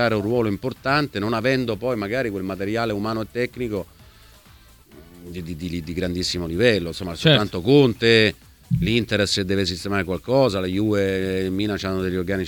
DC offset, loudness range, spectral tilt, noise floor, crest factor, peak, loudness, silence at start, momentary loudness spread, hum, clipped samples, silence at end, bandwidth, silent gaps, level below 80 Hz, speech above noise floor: under 0.1%; 10 LU; -5.5 dB/octave; -50 dBFS; 20 dB; -2 dBFS; -22 LUFS; 0 s; 11 LU; none; under 0.1%; 0 s; 19 kHz; none; -46 dBFS; 28 dB